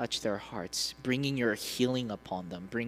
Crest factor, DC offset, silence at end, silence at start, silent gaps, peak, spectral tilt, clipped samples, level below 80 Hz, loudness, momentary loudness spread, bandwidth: 18 dB; under 0.1%; 0 s; 0 s; none; -16 dBFS; -4 dB/octave; under 0.1%; -62 dBFS; -33 LUFS; 8 LU; 16 kHz